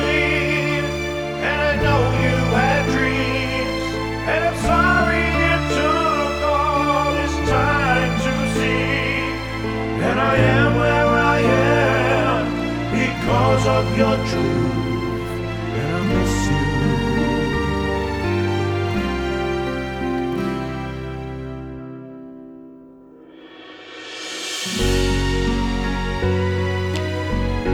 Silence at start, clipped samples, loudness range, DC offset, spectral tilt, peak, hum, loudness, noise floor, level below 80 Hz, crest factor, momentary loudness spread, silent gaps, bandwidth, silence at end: 0 s; under 0.1%; 9 LU; under 0.1%; -5.5 dB/octave; -4 dBFS; none; -19 LUFS; -44 dBFS; -30 dBFS; 16 dB; 11 LU; none; 17 kHz; 0 s